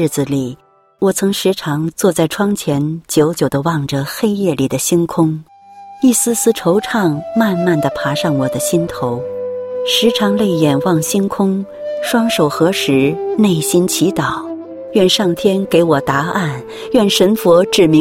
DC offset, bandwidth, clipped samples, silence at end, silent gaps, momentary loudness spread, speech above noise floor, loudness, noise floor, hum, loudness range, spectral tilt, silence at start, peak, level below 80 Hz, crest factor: under 0.1%; 16.5 kHz; under 0.1%; 0 s; none; 8 LU; 23 dB; -15 LUFS; -37 dBFS; none; 2 LU; -4.5 dB/octave; 0 s; 0 dBFS; -48 dBFS; 14 dB